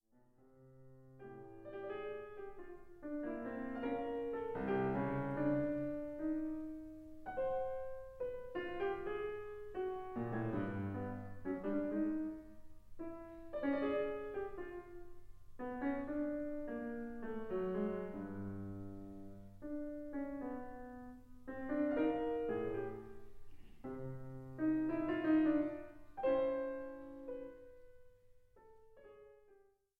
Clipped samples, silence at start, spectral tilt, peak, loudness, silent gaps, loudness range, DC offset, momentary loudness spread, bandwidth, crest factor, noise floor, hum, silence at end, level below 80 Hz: under 0.1%; 0.45 s; -9 dB/octave; -24 dBFS; -41 LUFS; none; 7 LU; under 0.1%; 17 LU; 4.6 kHz; 18 dB; -69 dBFS; none; 0.4 s; -62 dBFS